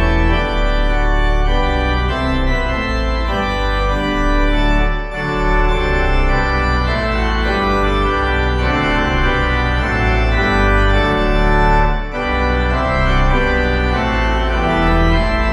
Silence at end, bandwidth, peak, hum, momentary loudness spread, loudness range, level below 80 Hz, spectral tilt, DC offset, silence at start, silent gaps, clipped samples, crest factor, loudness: 0 s; 8.4 kHz; -2 dBFS; none; 4 LU; 2 LU; -18 dBFS; -6.5 dB/octave; under 0.1%; 0 s; none; under 0.1%; 12 dB; -16 LUFS